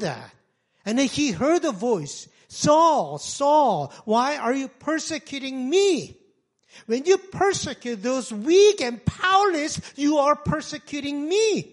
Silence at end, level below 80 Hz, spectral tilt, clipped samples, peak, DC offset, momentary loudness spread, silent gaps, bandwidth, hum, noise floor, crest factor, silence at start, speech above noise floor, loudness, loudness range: 0.1 s; -56 dBFS; -4 dB/octave; under 0.1%; -6 dBFS; under 0.1%; 12 LU; none; 11.5 kHz; none; -64 dBFS; 18 dB; 0 s; 41 dB; -22 LUFS; 3 LU